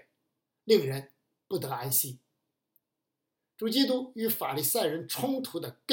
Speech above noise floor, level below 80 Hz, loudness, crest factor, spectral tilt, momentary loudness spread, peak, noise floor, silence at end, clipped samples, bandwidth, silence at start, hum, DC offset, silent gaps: 56 dB; -84 dBFS; -29 LUFS; 22 dB; -4 dB/octave; 11 LU; -10 dBFS; -86 dBFS; 0 s; under 0.1%; 17 kHz; 0.65 s; none; under 0.1%; none